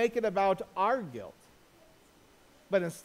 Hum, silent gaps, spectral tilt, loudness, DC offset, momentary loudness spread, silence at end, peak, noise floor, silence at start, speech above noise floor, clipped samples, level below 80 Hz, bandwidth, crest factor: none; none; -5.5 dB/octave; -31 LUFS; under 0.1%; 16 LU; 0.05 s; -16 dBFS; -61 dBFS; 0 s; 31 dB; under 0.1%; -68 dBFS; 16 kHz; 18 dB